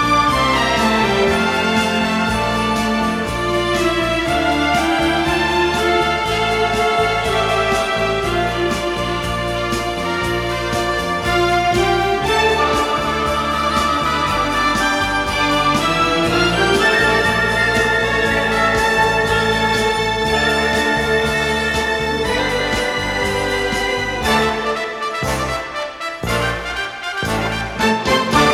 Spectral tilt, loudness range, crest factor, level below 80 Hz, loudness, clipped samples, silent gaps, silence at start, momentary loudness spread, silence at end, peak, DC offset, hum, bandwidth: -4 dB/octave; 4 LU; 16 dB; -34 dBFS; -17 LUFS; under 0.1%; none; 0 s; 6 LU; 0 s; -2 dBFS; under 0.1%; none; 17.5 kHz